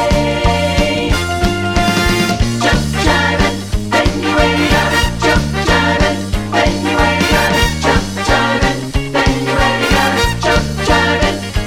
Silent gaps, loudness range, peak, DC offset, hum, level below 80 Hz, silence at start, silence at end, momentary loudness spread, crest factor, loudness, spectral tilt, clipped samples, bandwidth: none; 1 LU; 0 dBFS; under 0.1%; none; -22 dBFS; 0 s; 0 s; 4 LU; 12 dB; -13 LUFS; -4.5 dB/octave; under 0.1%; 18 kHz